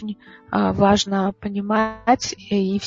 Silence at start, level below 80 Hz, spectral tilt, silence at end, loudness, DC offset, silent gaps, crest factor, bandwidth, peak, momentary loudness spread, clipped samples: 0 s; -46 dBFS; -5 dB/octave; 0 s; -20 LUFS; under 0.1%; none; 18 dB; 7.8 kHz; -2 dBFS; 10 LU; under 0.1%